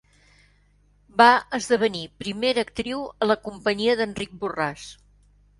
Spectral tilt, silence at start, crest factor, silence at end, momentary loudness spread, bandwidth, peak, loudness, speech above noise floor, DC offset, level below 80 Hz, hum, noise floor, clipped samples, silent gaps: -4 dB/octave; 1.15 s; 24 dB; 0.65 s; 15 LU; 11.5 kHz; -2 dBFS; -23 LUFS; 37 dB; under 0.1%; -56 dBFS; 50 Hz at -50 dBFS; -60 dBFS; under 0.1%; none